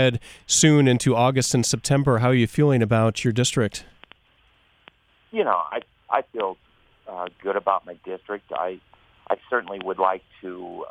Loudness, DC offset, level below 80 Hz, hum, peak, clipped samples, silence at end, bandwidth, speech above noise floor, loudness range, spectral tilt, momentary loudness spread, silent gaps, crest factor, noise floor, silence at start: -22 LUFS; under 0.1%; -54 dBFS; none; -2 dBFS; under 0.1%; 0 s; 15.5 kHz; 39 dB; 10 LU; -5 dB/octave; 17 LU; none; 20 dB; -61 dBFS; 0 s